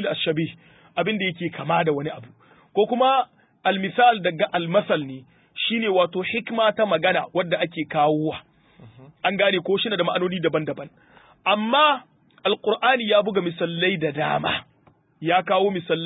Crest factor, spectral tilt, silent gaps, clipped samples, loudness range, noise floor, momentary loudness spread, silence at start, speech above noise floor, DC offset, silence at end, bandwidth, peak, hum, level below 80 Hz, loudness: 18 dB; -10 dB/octave; none; under 0.1%; 2 LU; -59 dBFS; 11 LU; 0 s; 37 dB; under 0.1%; 0 s; 4 kHz; -4 dBFS; none; -64 dBFS; -22 LUFS